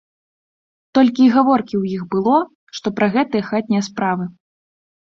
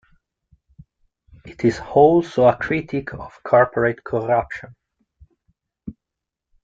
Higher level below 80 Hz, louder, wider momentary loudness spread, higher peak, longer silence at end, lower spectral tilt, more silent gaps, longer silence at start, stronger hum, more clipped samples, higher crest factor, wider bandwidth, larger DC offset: second, -60 dBFS vs -50 dBFS; about the same, -17 LUFS vs -18 LUFS; second, 12 LU vs 21 LU; about the same, -2 dBFS vs -2 dBFS; about the same, 0.85 s vs 0.75 s; about the same, -6.5 dB/octave vs -7.5 dB/octave; first, 2.55-2.67 s vs none; second, 0.95 s vs 1.45 s; neither; neither; about the same, 16 dB vs 20 dB; about the same, 7.4 kHz vs 7.6 kHz; neither